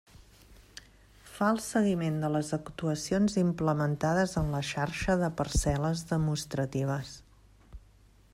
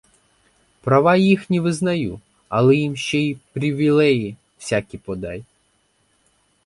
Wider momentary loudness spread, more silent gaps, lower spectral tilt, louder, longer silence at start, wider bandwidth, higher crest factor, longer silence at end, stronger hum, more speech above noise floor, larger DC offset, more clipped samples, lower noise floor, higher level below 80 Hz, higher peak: second, 13 LU vs 16 LU; neither; about the same, -6 dB/octave vs -6.5 dB/octave; second, -30 LUFS vs -19 LUFS; second, 0.5 s vs 0.85 s; first, 15.5 kHz vs 11.5 kHz; about the same, 18 dB vs 18 dB; second, 0.55 s vs 1.25 s; neither; second, 30 dB vs 45 dB; neither; neither; second, -59 dBFS vs -64 dBFS; first, -46 dBFS vs -52 dBFS; second, -14 dBFS vs -2 dBFS